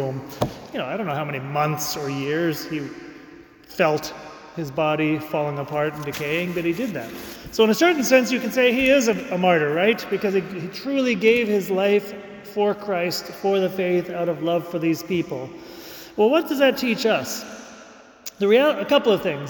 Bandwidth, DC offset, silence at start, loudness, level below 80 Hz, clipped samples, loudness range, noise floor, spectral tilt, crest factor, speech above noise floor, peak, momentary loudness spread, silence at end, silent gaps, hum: 19 kHz; under 0.1%; 0 s; -22 LUFS; -56 dBFS; under 0.1%; 6 LU; -46 dBFS; -5 dB/octave; 18 dB; 24 dB; -4 dBFS; 16 LU; 0 s; none; none